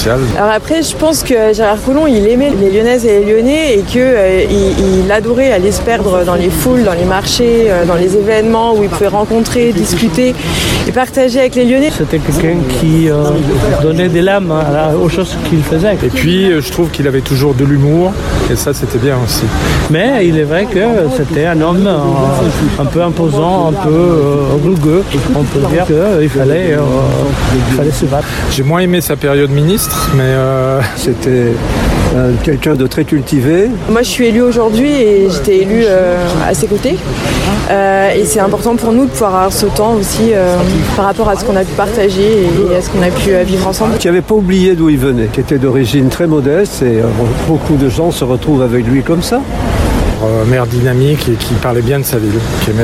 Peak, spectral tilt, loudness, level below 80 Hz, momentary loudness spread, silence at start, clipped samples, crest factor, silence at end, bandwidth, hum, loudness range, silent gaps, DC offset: 0 dBFS; -6 dB/octave; -11 LUFS; -24 dBFS; 4 LU; 0 s; under 0.1%; 10 dB; 0 s; 16.5 kHz; none; 2 LU; none; under 0.1%